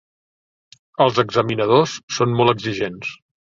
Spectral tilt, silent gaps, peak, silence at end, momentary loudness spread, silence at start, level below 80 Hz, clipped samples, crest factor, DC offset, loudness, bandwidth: -5.5 dB/octave; 2.03-2.08 s; -2 dBFS; 0.35 s; 12 LU; 1 s; -56 dBFS; under 0.1%; 18 dB; under 0.1%; -18 LUFS; 7.6 kHz